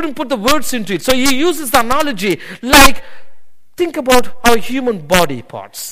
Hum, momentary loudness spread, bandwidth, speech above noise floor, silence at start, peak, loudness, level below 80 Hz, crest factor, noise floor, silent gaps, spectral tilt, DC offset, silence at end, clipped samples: none; 12 LU; over 20 kHz; 21 dB; 0 s; 0 dBFS; -13 LUFS; -28 dBFS; 14 dB; -33 dBFS; none; -3 dB/octave; 10%; 0 s; 0.3%